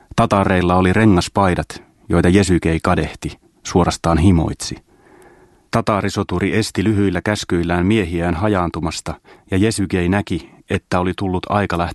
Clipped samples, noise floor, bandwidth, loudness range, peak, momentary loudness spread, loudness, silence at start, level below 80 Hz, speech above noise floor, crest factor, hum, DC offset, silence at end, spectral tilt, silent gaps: under 0.1%; -48 dBFS; 12.5 kHz; 4 LU; 0 dBFS; 12 LU; -17 LUFS; 0.15 s; -34 dBFS; 32 dB; 18 dB; none; under 0.1%; 0 s; -6 dB/octave; none